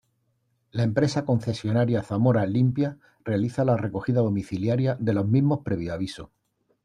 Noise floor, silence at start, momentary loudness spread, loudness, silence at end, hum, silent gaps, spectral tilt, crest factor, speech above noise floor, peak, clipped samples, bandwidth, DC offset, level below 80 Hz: -71 dBFS; 0.75 s; 8 LU; -25 LUFS; 0.6 s; none; none; -8 dB/octave; 16 dB; 48 dB; -8 dBFS; under 0.1%; 10.5 kHz; under 0.1%; -58 dBFS